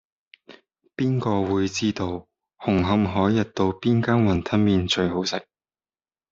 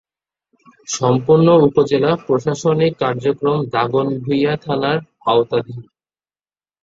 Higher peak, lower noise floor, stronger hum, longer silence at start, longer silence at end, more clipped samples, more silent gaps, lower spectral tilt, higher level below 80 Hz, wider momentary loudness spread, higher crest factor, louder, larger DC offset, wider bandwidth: second, -6 dBFS vs -2 dBFS; about the same, under -90 dBFS vs under -90 dBFS; neither; second, 0.5 s vs 0.9 s; about the same, 0.9 s vs 1 s; neither; neither; about the same, -6 dB/octave vs -6 dB/octave; about the same, -54 dBFS vs -56 dBFS; about the same, 9 LU vs 9 LU; about the same, 18 dB vs 16 dB; second, -23 LUFS vs -16 LUFS; neither; about the same, 7.8 kHz vs 7.8 kHz